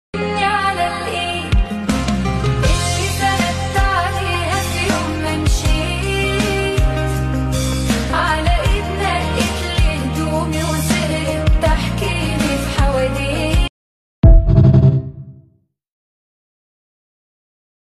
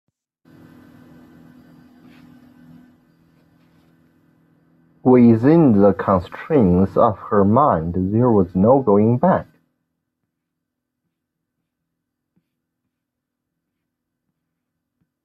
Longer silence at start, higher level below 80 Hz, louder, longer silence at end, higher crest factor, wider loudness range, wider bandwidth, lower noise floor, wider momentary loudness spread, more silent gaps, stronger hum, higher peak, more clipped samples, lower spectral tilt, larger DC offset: second, 0.15 s vs 5.05 s; first, -22 dBFS vs -54 dBFS; about the same, -17 LUFS vs -16 LUFS; second, 2.45 s vs 5.8 s; about the same, 16 dB vs 18 dB; second, 3 LU vs 7 LU; first, 14 kHz vs 5 kHz; second, -56 dBFS vs -80 dBFS; about the same, 6 LU vs 8 LU; first, 13.69-14.23 s vs none; neither; about the same, 0 dBFS vs -2 dBFS; neither; second, -5 dB/octave vs -11.5 dB/octave; neither